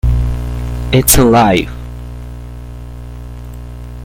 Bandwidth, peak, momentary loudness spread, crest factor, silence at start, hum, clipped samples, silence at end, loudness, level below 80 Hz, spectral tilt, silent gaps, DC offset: 17 kHz; 0 dBFS; 22 LU; 14 dB; 0.05 s; 60 Hz at -25 dBFS; under 0.1%; 0 s; -12 LUFS; -22 dBFS; -4.5 dB/octave; none; under 0.1%